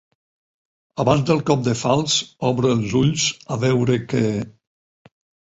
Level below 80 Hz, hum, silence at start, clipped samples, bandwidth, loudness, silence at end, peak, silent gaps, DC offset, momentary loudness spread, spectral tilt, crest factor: -50 dBFS; none; 0.95 s; under 0.1%; 8 kHz; -20 LUFS; 0.95 s; -2 dBFS; none; under 0.1%; 5 LU; -5 dB/octave; 18 dB